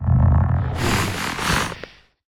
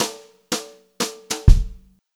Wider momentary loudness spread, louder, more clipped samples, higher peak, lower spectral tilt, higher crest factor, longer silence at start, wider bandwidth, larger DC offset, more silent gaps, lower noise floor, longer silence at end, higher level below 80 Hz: second, 13 LU vs 20 LU; first, -20 LUFS vs -23 LUFS; neither; second, -6 dBFS vs 0 dBFS; about the same, -5 dB/octave vs -4.5 dB/octave; second, 14 dB vs 20 dB; about the same, 0 s vs 0 s; about the same, 17 kHz vs 16 kHz; neither; neither; about the same, -41 dBFS vs -39 dBFS; about the same, 0.4 s vs 0.4 s; second, -30 dBFS vs -22 dBFS